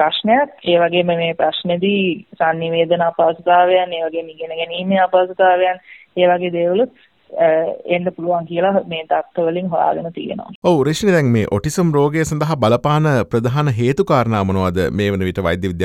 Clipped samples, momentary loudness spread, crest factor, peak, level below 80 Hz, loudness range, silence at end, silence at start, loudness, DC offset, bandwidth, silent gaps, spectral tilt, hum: under 0.1%; 7 LU; 14 dB; -2 dBFS; -48 dBFS; 2 LU; 0 s; 0 s; -17 LUFS; under 0.1%; 15 kHz; 10.55-10.62 s; -6 dB/octave; none